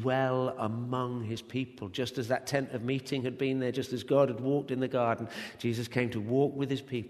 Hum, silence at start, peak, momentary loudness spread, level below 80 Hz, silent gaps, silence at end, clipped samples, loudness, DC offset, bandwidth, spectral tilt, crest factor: none; 0 s; -12 dBFS; 7 LU; -68 dBFS; none; 0 s; under 0.1%; -32 LUFS; under 0.1%; 13.5 kHz; -6.5 dB/octave; 18 dB